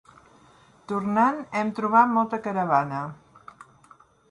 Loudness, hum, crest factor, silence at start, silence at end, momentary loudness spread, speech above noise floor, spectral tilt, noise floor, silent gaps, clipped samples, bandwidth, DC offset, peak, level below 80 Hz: -24 LUFS; none; 20 dB; 0.9 s; 1.15 s; 12 LU; 32 dB; -7.5 dB/octave; -56 dBFS; none; under 0.1%; 11 kHz; under 0.1%; -6 dBFS; -68 dBFS